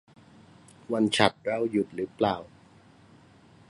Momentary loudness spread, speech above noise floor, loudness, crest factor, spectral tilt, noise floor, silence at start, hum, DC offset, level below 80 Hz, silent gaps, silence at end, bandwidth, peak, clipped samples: 10 LU; 29 dB; -27 LUFS; 26 dB; -4.5 dB/octave; -56 dBFS; 0.9 s; none; under 0.1%; -62 dBFS; none; 1.25 s; 11.5 kHz; -4 dBFS; under 0.1%